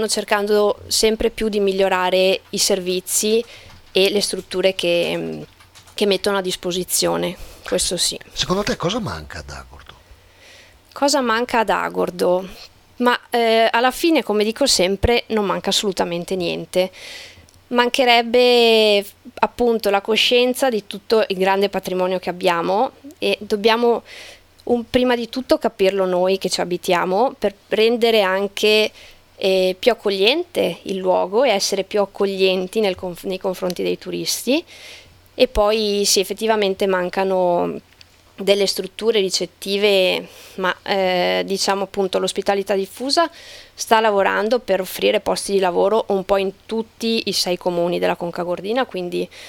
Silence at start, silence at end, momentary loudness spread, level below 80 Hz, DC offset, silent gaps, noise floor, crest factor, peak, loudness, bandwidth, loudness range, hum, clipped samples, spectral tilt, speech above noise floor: 0 s; 0 s; 9 LU; -44 dBFS; under 0.1%; none; -48 dBFS; 20 dB; 0 dBFS; -19 LUFS; 18.5 kHz; 4 LU; none; under 0.1%; -3 dB/octave; 29 dB